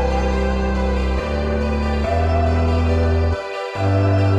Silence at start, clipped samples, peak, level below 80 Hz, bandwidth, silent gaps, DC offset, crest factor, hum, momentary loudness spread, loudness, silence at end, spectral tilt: 0 s; under 0.1%; -8 dBFS; -22 dBFS; 8.6 kHz; none; under 0.1%; 10 dB; none; 4 LU; -19 LUFS; 0 s; -7.5 dB/octave